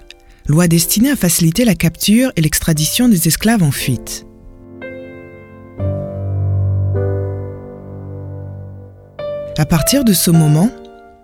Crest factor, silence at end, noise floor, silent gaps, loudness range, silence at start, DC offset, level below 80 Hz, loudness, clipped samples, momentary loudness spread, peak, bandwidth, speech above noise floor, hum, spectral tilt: 16 dB; 0.25 s; -37 dBFS; none; 9 LU; 0.45 s; under 0.1%; -36 dBFS; -14 LUFS; under 0.1%; 19 LU; 0 dBFS; 17.5 kHz; 25 dB; none; -5 dB/octave